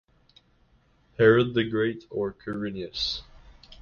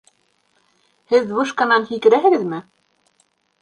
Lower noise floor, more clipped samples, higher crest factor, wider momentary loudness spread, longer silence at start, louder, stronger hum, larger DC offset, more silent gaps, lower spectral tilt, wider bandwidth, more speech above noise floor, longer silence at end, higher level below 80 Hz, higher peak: about the same, -63 dBFS vs -64 dBFS; neither; about the same, 22 dB vs 18 dB; first, 13 LU vs 9 LU; about the same, 1.2 s vs 1.1 s; second, -26 LUFS vs -17 LUFS; neither; neither; neither; first, -6.5 dB/octave vs -5 dB/octave; second, 7 kHz vs 9.8 kHz; second, 38 dB vs 47 dB; second, 0.05 s vs 1 s; first, -54 dBFS vs -68 dBFS; second, -6 dBFS vs -2 dBFS